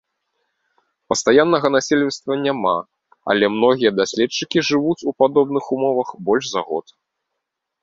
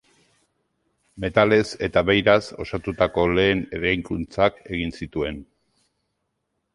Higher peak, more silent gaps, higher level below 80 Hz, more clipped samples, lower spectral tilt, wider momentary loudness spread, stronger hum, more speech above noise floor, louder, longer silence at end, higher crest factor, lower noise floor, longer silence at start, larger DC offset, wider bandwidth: about the same, 0 dBFS vs -2 dBFS; neither; second, -60 dBFS vs -44 dBFS; neither; second, -4 dB/octave vs -6 dB/octave; second, 8 LU vs 12 LU; neither; first, 61 dB vs 54 dB; first, -18 LUFS vs -22 LUFS; second, 1.05 s vs 1.3 s; about the same, 18 dB vs 20 dB; about the same, -79 dBFS vs -76 dBFS; about the same, 1.1 s vs 1.15 s; neither; second, 7.8 kHz vs 11.5 kHz